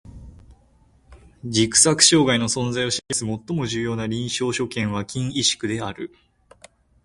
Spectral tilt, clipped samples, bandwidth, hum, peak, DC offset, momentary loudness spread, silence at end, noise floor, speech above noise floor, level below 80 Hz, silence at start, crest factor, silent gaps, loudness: -3 dB/octave; under 0.1%; 11.5 kHz; none; 0 dBFS; under 0.1%; 13 LU; 1 s; -57 dBFS; 35 dB; -50 dBFS; 0.05 s; 22 dB; none; -20 LUFS